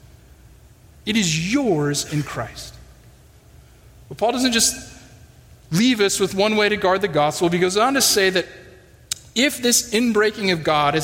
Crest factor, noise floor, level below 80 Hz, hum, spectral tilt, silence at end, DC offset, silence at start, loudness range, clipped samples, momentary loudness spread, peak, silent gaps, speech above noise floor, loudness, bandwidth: 18 dB; -48 dBFS; -50 dBFS; none; -3 dB/octave; 0 s; under 0.1%; 1.05 s; 6 LU; under 0.1%; 14 LU; -4 dBFS; none; 29 dB; -19 LUFS; 16.5 kHz